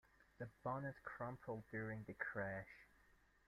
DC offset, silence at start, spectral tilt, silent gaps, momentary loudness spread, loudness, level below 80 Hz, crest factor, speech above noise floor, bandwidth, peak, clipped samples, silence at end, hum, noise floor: under 0.1%; 0.2 s; -8.5 dB/octave; none; 10 LU; -49 LUFS; -74 dBFS; 20 dB; 25 dB; 14.5 kHz; -32 dBFS; under 0.1%; 0.35 s; none; -74 dBFS